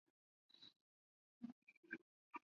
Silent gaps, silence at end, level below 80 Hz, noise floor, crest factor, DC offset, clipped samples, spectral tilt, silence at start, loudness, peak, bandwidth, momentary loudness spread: 0.76-1.41 s, 1.52-1.67 s, 1.77-1.83 s, 2.02-2.31 s; 0.05 s; under -90 dBFS; under -90 dBFS; 26 dB; under 0.1%; under 0.1%; -2 dB/octave; 0.55 s; -60 LUFS; -36 dBFS; 6.8 kHz; 9 LU